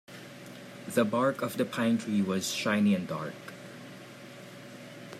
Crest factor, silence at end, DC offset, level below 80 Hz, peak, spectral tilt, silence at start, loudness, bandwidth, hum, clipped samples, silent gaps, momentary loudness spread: 20 dB; 0 s; under 0.1%; -78 dBFS; -12 dBFS; -5 dB/octave; 0.1 s; -29 LUFS; 15.5 kHz; none; under 0.1%; none; 20 LU